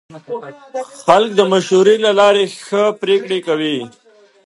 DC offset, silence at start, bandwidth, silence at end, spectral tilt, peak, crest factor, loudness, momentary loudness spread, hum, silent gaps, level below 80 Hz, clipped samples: under 0.1%; 0.1 s; 11.5 kHz; 0.55 s; -4.5 dB/octave; 0 dBFS; 16 dB; -14 LUFS; 17 LU; none; none; -64 dBFS; under 0.1%